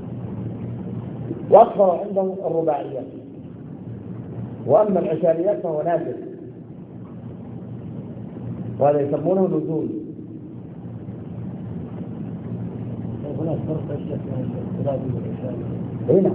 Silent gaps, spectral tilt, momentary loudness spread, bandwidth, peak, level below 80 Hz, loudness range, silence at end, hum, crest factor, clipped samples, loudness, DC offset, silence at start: none; -13 dB/octave; 18 LU; 4 kHz; 0 dBFS; -52 dBFS; 9 LU; 0 s; none; 22 dB; under 0.1%; -23 LUFS; under 0.1%; 0 s